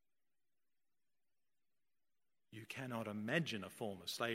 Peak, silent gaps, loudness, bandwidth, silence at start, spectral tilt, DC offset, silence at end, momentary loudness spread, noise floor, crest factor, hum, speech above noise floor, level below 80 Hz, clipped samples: -20 dBFS; none; -43 LUFS; 16 kHz; 2.5 s; -4.5 dB/octave; under 0.1%; 0 s; 14 LU; under -90 dBFS; 28 dB; none; over 47 dB; -88 dBFS; under 0.1%